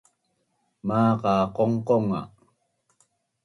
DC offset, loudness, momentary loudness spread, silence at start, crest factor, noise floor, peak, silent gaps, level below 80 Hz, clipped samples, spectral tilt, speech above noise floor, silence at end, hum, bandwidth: under 0.1%; -24 LUFS; 11 LU; 0.85 s; 18 dB; -73 dBFS; -10 dBFS; none; -60 dBFS; under 0.1%; -8.5 dB/octave; 50 dB; 1.15 s; none; 11 kHz